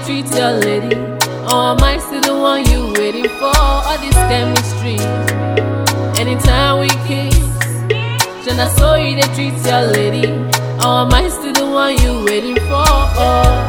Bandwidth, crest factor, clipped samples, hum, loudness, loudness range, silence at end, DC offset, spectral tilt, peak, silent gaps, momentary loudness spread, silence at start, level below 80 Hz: over 20 kHz; 14 dB; under 0.1%; none; -14 LUFS; 1 LU; 0 s; under 0.1%; -4.5 dB/octave; 0 dBFS; none; 5 LU; 0 s; -20 dBFS